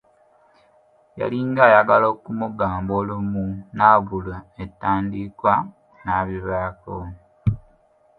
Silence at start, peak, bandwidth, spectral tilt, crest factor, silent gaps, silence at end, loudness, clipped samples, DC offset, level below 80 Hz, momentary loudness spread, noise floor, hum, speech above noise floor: 1.15 s; 0 dBFS; 4.9 kHz; -10 dB/octave; 22 dB; none; 0.6 s; -20 LUFS; under 0.1%; under 0.1%; -44 dBFS; 19 LU; -58 dBFS; none; 37 dB